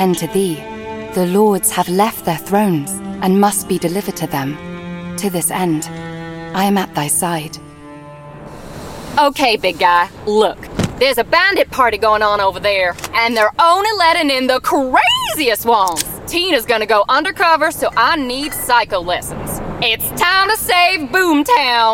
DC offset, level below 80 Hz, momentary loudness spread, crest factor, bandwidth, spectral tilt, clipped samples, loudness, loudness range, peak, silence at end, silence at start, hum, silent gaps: under 0.1%; -42 dBFS; 14 LU; 14 dB; 17 kHz; -3.5 dB/octave; under 0.1%; -14 LUFS; 6 LU; 0 dBFS; 0 s; 0 s; none; none